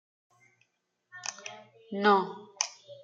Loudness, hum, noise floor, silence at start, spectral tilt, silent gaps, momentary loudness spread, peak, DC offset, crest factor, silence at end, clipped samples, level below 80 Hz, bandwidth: -30 LUFS; none; -78 dBFS; 1.15 s; -3 dB/octave; none; 21 LU; -8 dBFS; under 0.1%; 26 dB; 0.1 s; under 0.1%; -88 dBFS; 9.4 kHz